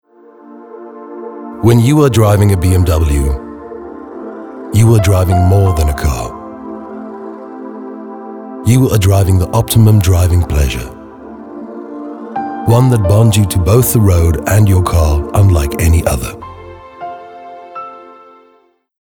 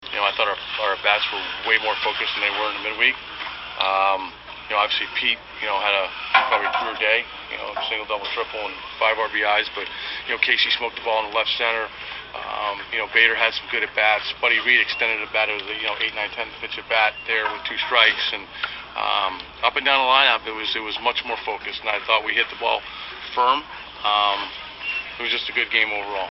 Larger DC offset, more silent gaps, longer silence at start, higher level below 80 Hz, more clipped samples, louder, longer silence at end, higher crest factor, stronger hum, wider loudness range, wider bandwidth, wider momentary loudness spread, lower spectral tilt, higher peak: neither; neither; first, 0.5 s vs 0 s; first, -22 dBFS vs -56 dBFS; neither; first, -11 LUFS vs -21 LUFS; first, 0.95 s vs 0 s; second, 12 dB vs 22 dB; second, none vs 60 Hz at -55 dBFS; first, 6 LU vs 3 LU; first, 19.5 kHz vs 6 kHz; first, 20 LU vs 12 LU; first, -6.5 dB/octave vs 2.5 dB/octave; about the same, 0 dBFS vs 0 dBFS